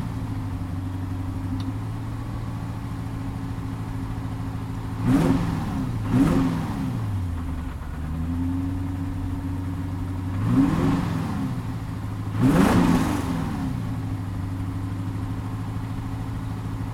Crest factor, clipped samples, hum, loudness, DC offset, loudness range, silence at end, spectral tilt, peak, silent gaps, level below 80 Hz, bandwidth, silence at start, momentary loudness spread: 20 dB; under 0.1%; none; -26 LUFS; under 0.1%; 8 LU; 0 s; -7.5 dB/octave; -6 dBFS; none; -36 dBFS; 16 kHz; 0 s; 11 LU